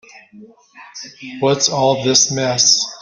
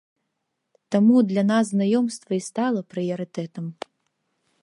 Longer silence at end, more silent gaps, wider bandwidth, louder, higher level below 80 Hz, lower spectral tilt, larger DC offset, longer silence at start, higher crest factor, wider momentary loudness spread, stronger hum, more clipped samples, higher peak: second, 0 s vs 0.9 s; neither; about the same, 11 kHz vs 11.5 kHz; first, -14 LUFS vs -22 LUFS; first, -60 dBFS vs -76 dBFS; second, -2.5 dB/octave vs -6.5 dB/octave; neither; second, 0.15 s vs 0.9 s; about the same, 18 dB vs 16 dB; first, 21 LU vs 16 LU; neither; neither; first, 0 dBFS vs -8 dBFS